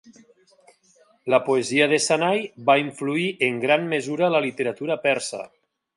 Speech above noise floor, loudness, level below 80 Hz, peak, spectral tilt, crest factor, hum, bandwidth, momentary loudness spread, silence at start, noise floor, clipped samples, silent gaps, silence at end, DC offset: 37 dB; -22 LUFS; -74 dBFS; -4 dBFS; -4 dB/octave; 18 dB; none; 11.5 kHz; 7 LU; 0.1 s; -59 dBFS; under 0.1%; none; 0.5 s; under 0.1%